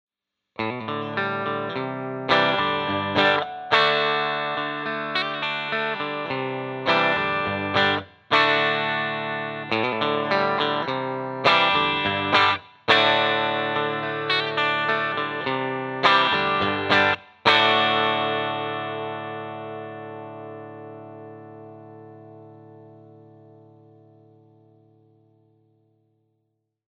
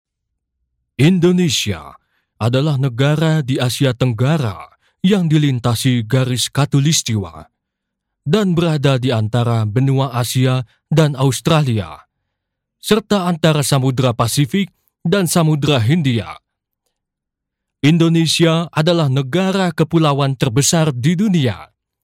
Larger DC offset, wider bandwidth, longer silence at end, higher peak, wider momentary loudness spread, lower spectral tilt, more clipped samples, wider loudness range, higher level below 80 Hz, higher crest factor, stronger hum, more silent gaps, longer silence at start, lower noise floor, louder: neither; second, 10 kHz vs 16.5 kHz; first, 3.85 s vs 0.4 s; about the same, -4 dBFS vs -4 dBFS; first, 17 LU vs 8 LU; about the same, -5 dB/octave vs -5.5 dB/octave; neither; first, 13 LU vs 2 LU; second, -64 dBFS vs -50 dBFS; first, 20 dB vs 12 dB; neither; neither; second, 0.6 s vs 1 s; second, -76 dBFS vs -80 dBFS; second, -22 LUFS vs -16 LUFS